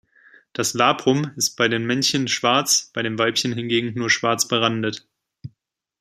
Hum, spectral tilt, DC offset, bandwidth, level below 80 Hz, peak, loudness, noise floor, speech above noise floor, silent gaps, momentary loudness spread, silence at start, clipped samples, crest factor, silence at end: none; -3 dB/octave; under 0.1%; 16 kHz; -64 dBFS; -2 dBFS; -20 LUFS; -71 dBFS; 51 dB; none; 8 LU; 0.6 s; under 0.1%; 20 dB; 0.5 s